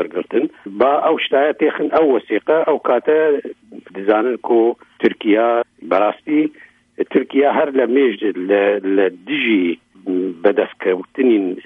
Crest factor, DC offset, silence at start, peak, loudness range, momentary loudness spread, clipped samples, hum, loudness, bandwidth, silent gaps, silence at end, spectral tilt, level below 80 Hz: 16 dB; under 0.1%; 0 s; 0 dBFS; 2 LU; 7 LU; under 0.1%; none; -17 LUFS; 4.3 kHz; none; 0.05 s; -7.5 dB/octave; -66 dBFS